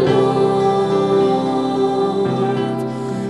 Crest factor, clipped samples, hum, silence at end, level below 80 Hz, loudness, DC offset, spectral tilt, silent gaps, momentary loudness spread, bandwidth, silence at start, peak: 12 dB; under 0.1%; none; 0 s; -56 dBFS; -17 LUFS; 0.2%; -7 dB/octave; none; 6 LU; 11 kHz; 0 s; -4 dBFS